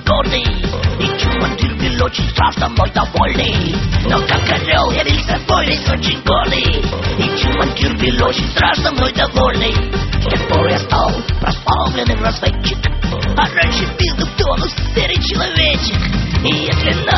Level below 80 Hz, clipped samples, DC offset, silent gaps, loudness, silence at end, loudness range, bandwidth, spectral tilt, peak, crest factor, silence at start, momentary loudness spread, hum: -20 dBFS; under 0.1%; under 0.1%; none; -15 LUFS; 0 s; 2 LU; 6.2 kHz; -5.5 dB/octave; 0 dBFS; 14 dB; 0 s; 4 LU; none